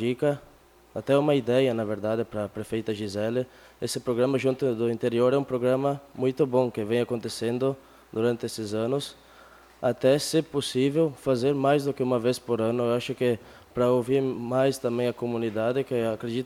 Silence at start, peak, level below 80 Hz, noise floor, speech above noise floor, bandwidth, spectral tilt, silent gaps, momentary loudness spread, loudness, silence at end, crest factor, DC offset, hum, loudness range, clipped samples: 0 s; -10 dBFS; -62 dBFS; -52 dBFS; 27 dB; 18.5 kHz; -6 dB/octave; none; 8 LU; -26 LUFS; 0 s; 16 dB; under 0.1%; none; 3 LU; under 0.1%